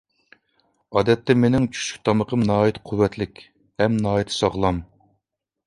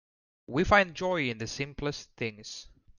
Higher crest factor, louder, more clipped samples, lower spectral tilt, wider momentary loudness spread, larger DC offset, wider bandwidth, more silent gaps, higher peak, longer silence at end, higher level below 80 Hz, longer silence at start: about the same, 20 dB vs 22 dB; first, -21 LUFS vs -29 LUFS; neither; first, -6 dB/octave vs -4.5 dB/octave; second, 7 LU vs 17 LU; neither; first, 11.5 kHz vs 10 kHz; neither; first, -2 dBFS vs -8 dBFS; first, 0.8 s vs 0.35 s; about the same, -46 dBFS vs -50 dBFS; first, 0.9 s vs 0.5 s